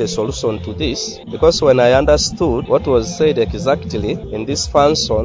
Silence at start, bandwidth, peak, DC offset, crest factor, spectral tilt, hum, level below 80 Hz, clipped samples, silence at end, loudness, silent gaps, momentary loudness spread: 0 s; 7.8 kHz; 0 dBFS; under 0.1%; 16 dB; -4.5 dB/octave; none; -30 dBFS; under 0.1%; 0 s; -16 LUFS; none; 10 LU